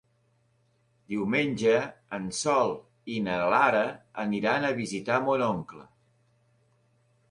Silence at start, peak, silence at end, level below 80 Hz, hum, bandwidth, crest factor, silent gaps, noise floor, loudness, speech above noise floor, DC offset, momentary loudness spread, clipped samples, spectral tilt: 1.1 s; -8 dBFS; 1.45 s; -66 dBFS; none; 11.5 kHz; 20 dB; none; -69 dBFS; -27 LUFS; 42 dB; under 0.1%; 13 LU; under 0.1%; -5 dB/octave